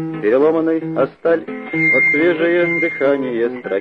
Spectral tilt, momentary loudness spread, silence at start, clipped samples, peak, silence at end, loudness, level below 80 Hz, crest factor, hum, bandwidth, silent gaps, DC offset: -8 dB/octave; 8 LU; 0 s; under 0.1%; -2 dBFS; 0 s; -16 LUFS; -62 dBFS; 14 dB; none; 5.2 kHz; none; under 0.1%